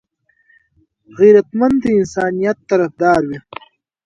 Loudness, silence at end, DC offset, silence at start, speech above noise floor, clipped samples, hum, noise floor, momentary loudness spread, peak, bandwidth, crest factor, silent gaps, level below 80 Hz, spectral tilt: -14 LUFS; 0.65 s; under 0.1%; 1.15 s; 45 dB; under 0.1%; none; -59 dBFS; 17 LU; 0 dBFS; 7.8 kHz; 16 dB; none; -52 dBFS; -7 dB/octave